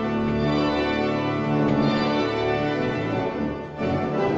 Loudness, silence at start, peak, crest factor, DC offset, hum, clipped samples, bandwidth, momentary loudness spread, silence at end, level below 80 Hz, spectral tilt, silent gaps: -24 LUFS; 0 s; -10 dBFS; 14 dB; under 0.1%; none; under 0.1%; 7.6 kHz; 5 LU; 0 s; -46 dBFS; -7.5 dB/octave; none